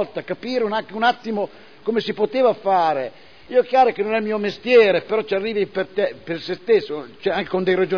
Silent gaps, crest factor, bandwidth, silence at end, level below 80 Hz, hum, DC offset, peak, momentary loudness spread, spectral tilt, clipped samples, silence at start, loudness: none; 16 dB; 5.4 kHz; 0 s; -62 dBFS; none; 0.4%; -4 dBFS; 11 LU; -6.5 dB/octave; under 0.1%; 0 s; -20 LUFS